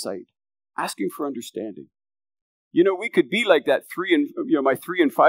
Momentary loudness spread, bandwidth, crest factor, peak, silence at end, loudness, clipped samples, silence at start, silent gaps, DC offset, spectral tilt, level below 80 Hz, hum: 14 LU; 16 kHz; 20 dB; -2 dBFS; 0 s; -22 LUFS; under 0.1%; 0 s; 2.42-2.71 s; under 0.1%; -4.5 dB/octave; -84 dBFS; none